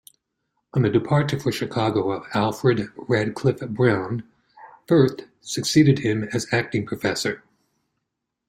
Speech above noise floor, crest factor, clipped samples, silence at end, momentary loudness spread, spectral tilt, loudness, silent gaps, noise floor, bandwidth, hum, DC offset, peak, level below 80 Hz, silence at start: 59 dB; 18 dB; under 0.1%; 1.1 s; 9 LU; -6 dB/octave; -22 LUFS; none; -80 dBFS; 16 kHz; none; under 0.1%; -4 dBFS; -56 dBFS; 0.75 s